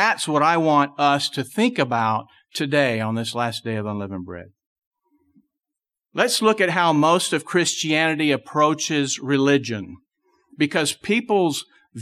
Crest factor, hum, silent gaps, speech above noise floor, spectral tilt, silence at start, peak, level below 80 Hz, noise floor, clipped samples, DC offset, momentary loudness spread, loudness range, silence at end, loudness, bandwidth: 18 dB; none; 4.66-4.76 s, 4.87-4.91 s; 66 dB; -4 dB/octave; 0 s; -4 dBFS; -66 dBFS; -87 dBFS; under 0.1%; under 0.1%; 12 LU; 7 LU; 0 s; -20 LUFS; 14 kHz